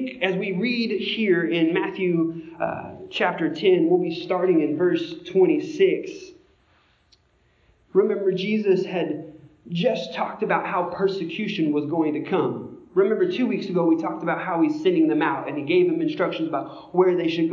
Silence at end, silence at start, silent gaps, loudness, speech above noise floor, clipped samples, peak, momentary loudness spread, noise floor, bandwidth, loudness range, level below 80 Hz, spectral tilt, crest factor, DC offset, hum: 0 s; 0 s; none; -23 LUFS; 40 dB; under 0.1%; -6 dBFS; 8 LU; -62 dBFS; 7.2 kHz; 4 LU; -66 dBFS; -7 dB/octave; 18 dB; under 0.1%; none